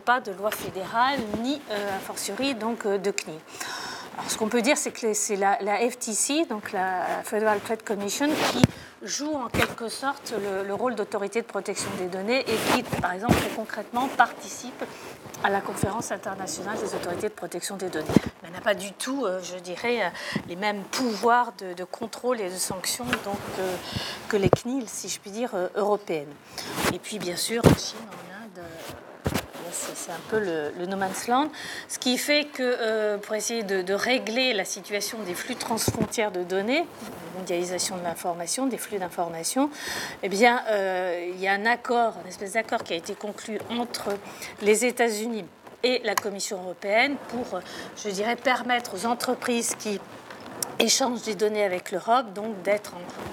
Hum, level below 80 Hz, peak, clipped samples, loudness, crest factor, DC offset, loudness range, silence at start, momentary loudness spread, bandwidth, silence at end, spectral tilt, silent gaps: none; -56 dBFS; 0 dBFS; under 0.1%; -27 LUFS; 26 dB; under 0.1%; 4 LU; 0 s; 11 LU; 17.5 kHz; 0 s; -3.5 dB/octave; none